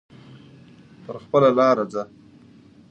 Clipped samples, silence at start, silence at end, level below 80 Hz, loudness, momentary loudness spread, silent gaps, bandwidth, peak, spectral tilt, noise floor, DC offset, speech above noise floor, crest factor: under 0.1%; 1.1 s; 0.85 s; -66 dBFS; -19 LUFS; 22 LU; none; 8.2 kHz; -6 dBFS; -7 dB/octave; -50 dBFS; under 0.1%; 30 dB; 18 dB